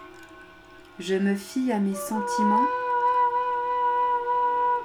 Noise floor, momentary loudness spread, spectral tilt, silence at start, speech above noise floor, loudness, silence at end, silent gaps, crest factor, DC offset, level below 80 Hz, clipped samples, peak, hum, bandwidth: -49 dBFS; 6 LU; -5.5 dB/octave; 0 s; 24 dB; -24 LUFS; 0 s; none; 14 dB; under 0.1%; -64 dBFS; under 0.1%; -12 dBFS; none; 17.5 kHz